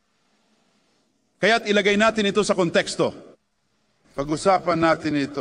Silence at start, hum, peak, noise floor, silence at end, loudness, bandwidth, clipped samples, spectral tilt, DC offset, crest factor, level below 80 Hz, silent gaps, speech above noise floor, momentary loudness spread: 1.4 s; none; -4 dBFS; -70 dBFS; 0 s; -21 LUFS; 10.5 kHz; under 0.1%; -4.5 dB/octave; under 0.1%; 18 dB; -56 dBFS; none; 50 dB; 8 LU